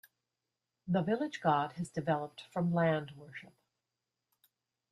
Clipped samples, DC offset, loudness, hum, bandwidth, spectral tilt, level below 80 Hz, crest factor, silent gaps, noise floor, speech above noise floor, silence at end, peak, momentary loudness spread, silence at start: under 0.1%; under 0.1%; -34 LUFS; none; 14 kHz; -7.5 dB/octave; -74 dBFS; 20 dB; none; -89 dBFS; 55 dB; 1.5 s; -16 dBFS; 18 LU; 0.85 s